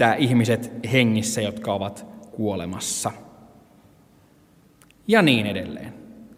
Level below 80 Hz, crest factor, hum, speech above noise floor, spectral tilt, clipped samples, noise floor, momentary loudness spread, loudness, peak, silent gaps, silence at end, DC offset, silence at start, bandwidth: -60 dBFS; 20 dB; none; 34 dB; -4.5 dB/octave; under 0.1%; -55 dBFS; 20 LU; -22 LUFS; -4 dBFS; none; 0.1 s; under 0.1%; 0 s; 16 kHz